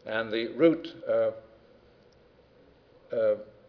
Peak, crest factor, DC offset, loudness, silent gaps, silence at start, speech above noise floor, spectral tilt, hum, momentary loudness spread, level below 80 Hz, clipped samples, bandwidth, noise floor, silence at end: -10 dBFS; 20 dB; under 0.1%; -28 LUFS; none; 0.05 s; 32 dB; -4 dB/octave; none; 10 LU; -68 dBFS; under 0.1%; 5.4 kHz; -59 dBFS; 0.25 s